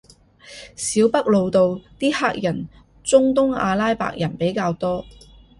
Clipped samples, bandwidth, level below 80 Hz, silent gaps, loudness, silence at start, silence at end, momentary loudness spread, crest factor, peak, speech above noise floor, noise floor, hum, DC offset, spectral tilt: under 0.1%; 11.5 kHz; -50 dBFS; none; -20 LUFS; 0.45 s; 0.5 s; 14 LU; 18 dB; -2 dBFS; 27 dB; -47 dBFS; none; under 0.1%; -5 dB/octave